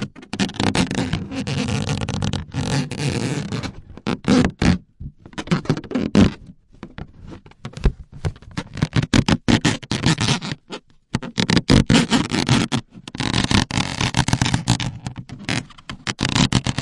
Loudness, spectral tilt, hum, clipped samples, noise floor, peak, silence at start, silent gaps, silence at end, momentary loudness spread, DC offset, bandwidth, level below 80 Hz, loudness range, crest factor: -21 LUFS; -5 dB/octave; none; under 0.1%; -43 dBFS; -4 dBFS; 0 s; none; 0 s; 17 LU; under 0.1%; 11.5 kHz; -34 dBFS; 5 LU; 18 dB